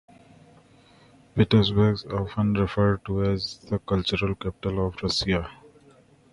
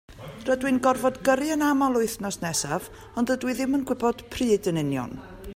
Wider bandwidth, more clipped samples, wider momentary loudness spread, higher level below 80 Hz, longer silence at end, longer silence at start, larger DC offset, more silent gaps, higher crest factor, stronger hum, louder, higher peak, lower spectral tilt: second, 11 kHz vs 16 kHz; neither; about the same, 9 LU vs 10 LU; first, -42 dBFS vs -52 dBFS; first, 0.8 s vs 0 s; first, 1.35 s vs 0.1 s; neither; neither; about the same, 20 dB vs 18 dB; neither; about the same, -25 LUFS vs -25 LUFS; about the same, -6 dBFS vs -8 dBFS; first, -6.5 dB/octave vs -4.5 dB/octave